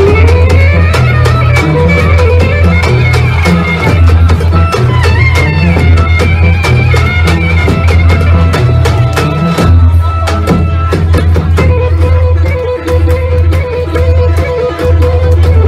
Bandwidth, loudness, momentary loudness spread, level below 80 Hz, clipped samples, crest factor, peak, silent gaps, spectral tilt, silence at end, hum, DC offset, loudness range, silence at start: 11 kHz; -8 LUFS; 4 LU; -14 dBFS; 0.1%; 6 dB; 0 dBFS; none; -7 dB/octave; 0 s; none; under 0.1%; 2 LU; 0 s